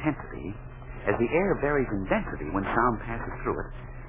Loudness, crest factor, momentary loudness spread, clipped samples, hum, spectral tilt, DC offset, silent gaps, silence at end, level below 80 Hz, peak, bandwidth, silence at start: -28 LUFS; 20 dB; 14 LU; under 0.1%; none; -6.5 dB/octave; under 0.1%; none; 0 s; -40 dBFS; -10 dBFS; 3.8 kHz; 0 s